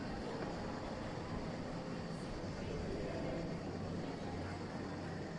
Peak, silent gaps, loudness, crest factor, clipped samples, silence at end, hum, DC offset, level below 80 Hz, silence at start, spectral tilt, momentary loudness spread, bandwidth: -30 dBFS; none; -44 LUFS; 14 dB; under 0.1%; 0 s; none; under 0.1%; -56 dBFS; 0 s; -6.5 dB/octave; 3 LU; 11 kHz